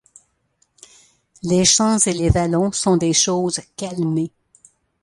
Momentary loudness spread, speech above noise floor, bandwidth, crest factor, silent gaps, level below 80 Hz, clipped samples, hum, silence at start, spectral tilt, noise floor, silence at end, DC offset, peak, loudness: 12 LU; 47 dB; 11.5 kHz; 18 dB; none; -38 dBFS; under 0.1%; none; 1.45 s; -4 dB/octave; -65 dBFS; 0.75 s; under 0.1%; -2 dBFS; -18 LUFS